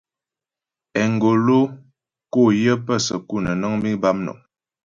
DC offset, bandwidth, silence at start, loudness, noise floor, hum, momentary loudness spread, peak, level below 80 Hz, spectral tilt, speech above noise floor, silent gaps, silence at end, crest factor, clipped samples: under 0.1%; 7.6 kHz; 0.95 s; -20 LUFS; -89 dBFS; none; 9 LU; -4 dBFS; -54 dBFS; -6 dB/octave; 69 dB; none; 0.5 s; 16 dB; under 0.1%